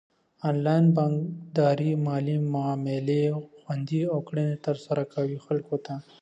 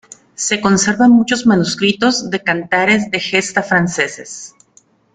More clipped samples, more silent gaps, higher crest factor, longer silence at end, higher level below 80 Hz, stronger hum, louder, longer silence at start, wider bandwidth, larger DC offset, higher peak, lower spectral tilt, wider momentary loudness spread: neither; neither; about the same, 16 dB vs 14 dB; second, 0.2 s vs 0.65 s; second, -72 dBFS vs -52 dBFS; neither; second, -27 LUFS vs -14 LUFS; about the same, 0.45 s vs 0.4 s; second, 8 kHz vs 9.4 kHz; neither; second, -10 dBFS vs 0 dBFS; first, -9 dB/octave vs -4 dB/octave; about the same, 11 LU vs 9 LU